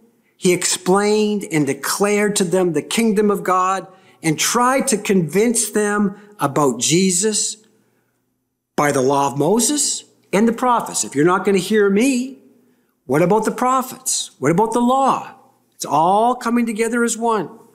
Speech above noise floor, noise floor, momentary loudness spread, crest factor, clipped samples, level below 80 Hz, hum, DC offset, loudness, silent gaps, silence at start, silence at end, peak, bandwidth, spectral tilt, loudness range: 54 dB; -71 dBFS; 6 LU; 14 dB; under 0.1%; -60 dBFS; none; under 0.1%; -17 LUFS; none; 0.4 s; 0.2 s; -4 dBFS; 16 kHz; -4 dB/octave; 2 LU